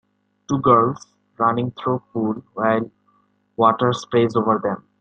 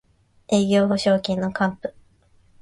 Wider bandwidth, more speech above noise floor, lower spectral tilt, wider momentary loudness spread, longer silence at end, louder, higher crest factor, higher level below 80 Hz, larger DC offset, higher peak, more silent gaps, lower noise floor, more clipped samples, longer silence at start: second, 8.8 kHz vs 11.5 kHz; first, 43 dB vs 37 dB; first, -7 dB/octave vs -5.5 dB/octave; about the same, 10 LU vs 10 LU; second, 0.2 s vs 0.7 s; about the same, -20 LUFS vs -21 LUFS; about the same, 18 dB vs 16 dB; about the same, -58 dBFS vs -56 dBFS; neither; first, -2 dBFS vs -6 dBFS; neither; first, -62 dBFS vs -57 dBFS; neither; about the same, 0.5 s vs 0.5 s